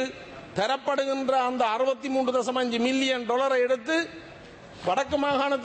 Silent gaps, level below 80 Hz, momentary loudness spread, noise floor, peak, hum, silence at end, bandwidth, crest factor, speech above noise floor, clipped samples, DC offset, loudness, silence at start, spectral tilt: none; -62 dBFS; 11 LU; -46 dBFS; -12 dBFS; none; 0 s; 8.8 kHz; 14 dB; 20 dB; under 0.1%; under 0.1%; -26 LUFS; 0 s; -4 dB/octave